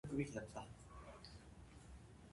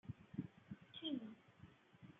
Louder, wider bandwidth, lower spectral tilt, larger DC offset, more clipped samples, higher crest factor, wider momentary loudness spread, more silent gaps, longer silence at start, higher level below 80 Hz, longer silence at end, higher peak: about the same, -52 LUFS vs -51 LUFS; first, 11.5 kHz vs 7.4 kHz; about the same, -6 dB/octave vs -5 dB/octave; neither; neither; about the same, 22 dB vs 20 dB; about the same, 16 LU vs 18 LU; neither; about the same, 0.05 s vs 0.05 s; first, -64 dBFS vs -80 dBFS; about the same, 0 s vs 0 s; about the same, -30 dBFS vs -32 dBFS